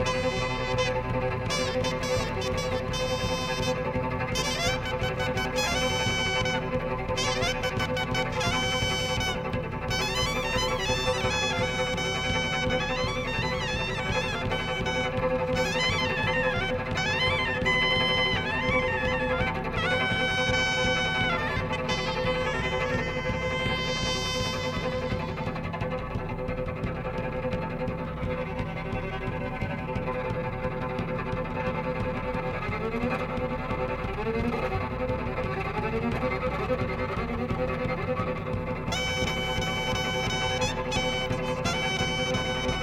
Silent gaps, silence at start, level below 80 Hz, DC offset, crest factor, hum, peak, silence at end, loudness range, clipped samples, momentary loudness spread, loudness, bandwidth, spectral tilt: none; 0 s; -40 dBFS; under 0.1%; 16 dB; none; -12 dBFS; 0 s; 6 LU; under 0.1%; 7 LU; -28 LUFS; 16 kHz; -4.5 dB/octave